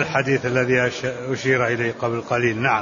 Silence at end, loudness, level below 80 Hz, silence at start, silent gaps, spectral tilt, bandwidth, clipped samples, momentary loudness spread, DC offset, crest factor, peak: 0 s; -21 LUFS; -54 dBFS; 0 s; none; -5.5 dB/octave; 7.4 kHz; under 0.1%; 6 LU; under 0.1%; 16 dB; -4 dBFS